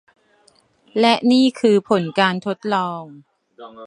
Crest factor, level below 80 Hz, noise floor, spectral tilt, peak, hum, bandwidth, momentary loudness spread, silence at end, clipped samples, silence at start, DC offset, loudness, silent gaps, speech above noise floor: 18 dB; -70 dBFS; -57 dBFS; -5.5 dB/octave; 0 dBFS; none; 11 kHz; 12 LU; 0 s; under 0.1%; 0.95 s; under 0.1%; -18 LUFS; none; 39 dB